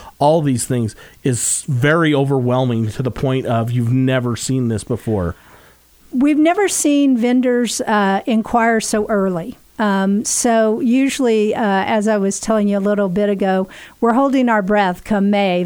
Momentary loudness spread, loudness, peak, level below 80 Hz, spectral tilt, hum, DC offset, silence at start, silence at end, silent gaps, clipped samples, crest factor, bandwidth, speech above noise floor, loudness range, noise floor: 7 LU; -16 LUFS; -2 dBFS; -46 dBFS; -5 dB/octave; none; under 0.1%; 0 s; 0 s; none; under 0.1%; 14 dB; over 20 kHz; 32 dB; 3 LU; -48 dBFS